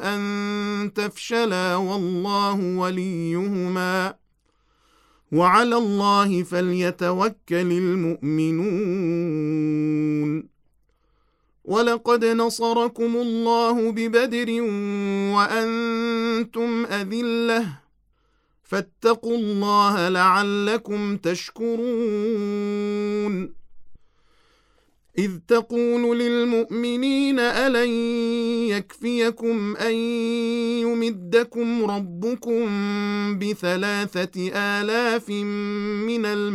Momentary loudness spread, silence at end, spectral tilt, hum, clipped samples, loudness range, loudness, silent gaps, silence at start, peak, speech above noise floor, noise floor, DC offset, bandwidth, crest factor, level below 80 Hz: 7 LU; 0 s; -5.5 dB/octave; none; under 0.1%; 4 LU; -23 LUFS; none; 0 s; -4 dBFS; 43 dB; -65 dBFS; under 0.1%; 14.5 kHz; 18 dB; -64 dBFS